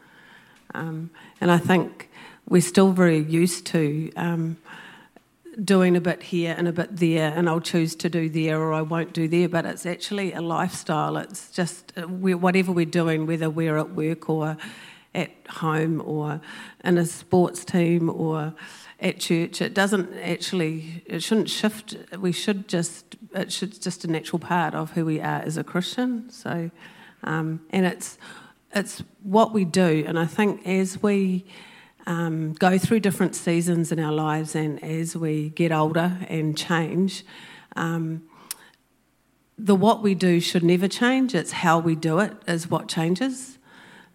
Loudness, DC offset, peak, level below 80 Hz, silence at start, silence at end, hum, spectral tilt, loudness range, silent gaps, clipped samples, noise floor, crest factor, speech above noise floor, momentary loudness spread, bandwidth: -24 LUFS; under 0.1%; -4 dBFS; -68 dBFS; 0.75 s; 0.6 s; none; -5.5 dB/octave; 5 LU; none; under 0.1%; -65 dBFS; 20 dB; 42 dB; 14 LU; 16 kHz